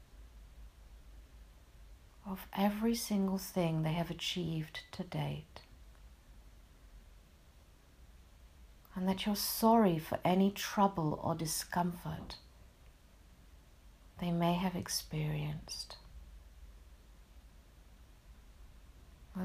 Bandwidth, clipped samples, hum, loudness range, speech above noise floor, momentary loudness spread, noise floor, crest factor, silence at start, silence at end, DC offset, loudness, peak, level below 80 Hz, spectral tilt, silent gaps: 15.5 kHz; under 0.1%; none; 14 LU; 27 dB; 21 LU; -61 dBFS; 22 dB; 0 s; 0 s; under 0.1%; -35 LUFS; -16 dBFS; -58 dBFS; -5 dB/octave; none